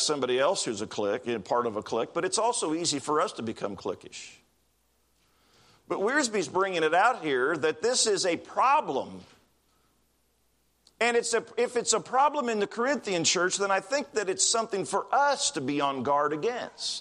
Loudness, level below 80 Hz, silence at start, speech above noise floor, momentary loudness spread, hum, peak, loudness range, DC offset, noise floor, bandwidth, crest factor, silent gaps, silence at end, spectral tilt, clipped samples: -27 LUFS; -74 dBFS; 0 s; 43 dB; 9 LU; none; -10 dBFS; 6 LU; under 0.1%; -70 dBFS; 12.5 kHz; 18 dB; none; 0 s; -2 dB/octave; under 0.1%